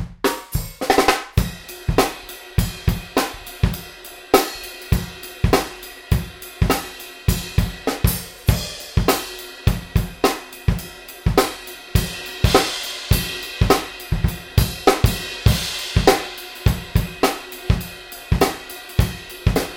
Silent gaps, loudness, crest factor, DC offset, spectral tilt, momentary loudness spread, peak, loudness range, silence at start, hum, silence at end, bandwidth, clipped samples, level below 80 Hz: none; -21 LUFS; 20 dB; under 0.1%; -5 dB/octave; 11 LU; 0 dBFS; 3 LU; 0 s; none; 0 s; 17 kHz; under 0.1%; -28 dBFS